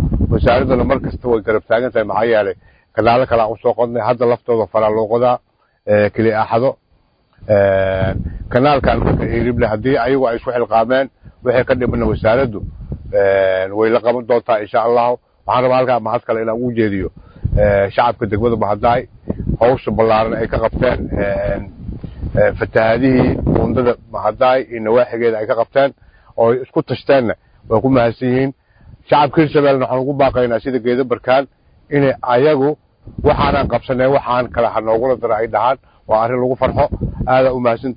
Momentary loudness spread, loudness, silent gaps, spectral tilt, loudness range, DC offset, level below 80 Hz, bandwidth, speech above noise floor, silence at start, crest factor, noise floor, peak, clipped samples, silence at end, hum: 8 LU; -15 LUFS; none; -10.5 dB/octave; 1 LU; under 0.1%; -32 dBFS; 5.2 kHz; 42 dB; 0 s; 16 dB; -57 dBFS; 0 dBFS; under 0.1%; 0 s; none